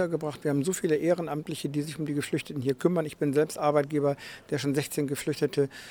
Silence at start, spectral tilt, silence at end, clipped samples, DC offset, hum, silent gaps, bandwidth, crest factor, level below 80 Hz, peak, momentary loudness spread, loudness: 0 s; -5.5 dB/octave; 0 s; under 0.1%; under 0.1%; none; none; over 20 kHz; 18 dB; -66 dBFS; -10 dBFS; 6 LU; -29 LUFS